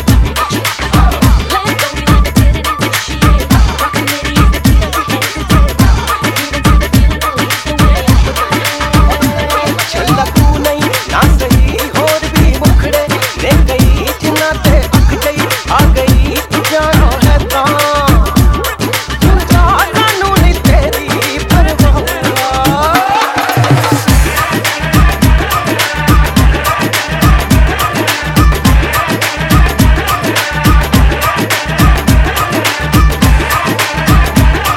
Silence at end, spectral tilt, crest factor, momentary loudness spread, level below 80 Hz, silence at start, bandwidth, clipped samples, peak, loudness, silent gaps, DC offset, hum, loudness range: 0 s; -5 dB/octave; 8 dB; 4 LU; -12 dBFS; 0 s; 17.5 kHz; 0.3%; 0 dBFS; -10 LUFS; none; under 0.1%; none; 1 LU